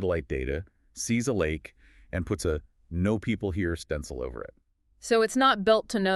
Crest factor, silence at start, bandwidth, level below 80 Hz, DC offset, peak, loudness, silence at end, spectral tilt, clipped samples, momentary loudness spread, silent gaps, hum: 18 dB; 0 s; 13.5 kHz; -46 dBFS; under 0.1%; -10 dBFS; -28 LUFS; 0 s; -5 dB/octave; under 0.1%; 15 LU; none; none